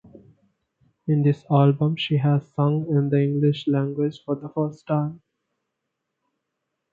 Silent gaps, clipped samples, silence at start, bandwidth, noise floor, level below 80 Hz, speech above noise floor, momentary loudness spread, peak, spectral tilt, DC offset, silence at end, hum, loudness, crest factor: none; under 0.1%; 1.05 s; 4.7 kHz; -80 dBFS; -68 dBFS; 59 dB; 9 LU; -4 dBFS; -9.5 dB/octave; under 0.1%; 1.75 s; none; -23 LUFS; 20 dB